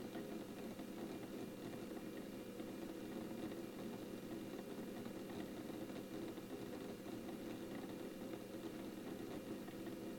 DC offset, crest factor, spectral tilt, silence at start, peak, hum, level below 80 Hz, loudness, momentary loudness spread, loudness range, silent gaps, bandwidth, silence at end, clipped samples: under 0.1%; 14 dB; -5.5 dB/octave; 0 s; -34 dBFS; none; -72 dBFS; -50 LUFS; 1 LU; 0 LU; none; 17.5 kHz; 0 s; under 0.1%